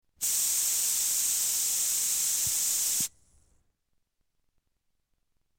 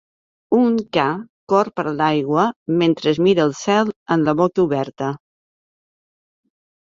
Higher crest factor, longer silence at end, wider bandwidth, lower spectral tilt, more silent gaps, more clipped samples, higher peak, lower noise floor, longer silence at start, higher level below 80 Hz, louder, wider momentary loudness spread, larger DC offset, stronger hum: about the same, 16 dB vs 18 dB; first, 2.5 s vs 1.7 s; first, over 20 kHz vs 7.6 kHz; second, 2 dB/octave vs -6.5 dB/octave; second, none vs 1.30-1.47 s, 2.56-2.66 s, 3.96-4.06 s; neither; second, -14 dBFS vs -2 dBFS; second, -78 dBFS vs under -90 dBFS; second, 0.2 s vs 0.5 s; second, -68 dBFS vs -60 dBFS; second, -25 LUFS vs -19 LUFS; second, 2 LU vs 6 LU; neither; neither